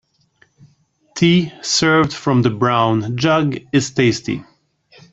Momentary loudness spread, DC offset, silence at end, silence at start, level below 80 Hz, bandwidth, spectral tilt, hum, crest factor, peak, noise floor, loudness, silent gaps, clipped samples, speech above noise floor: 7 LU; under 0.1%; 0.7 s; 1.15 s; -52 dBFS; 8.2 kHz; -5 dB/octave; none; 16 dB; -2 dBFS; -58 dBFS; -16 LUFS; none; under 0.1%; 42 dB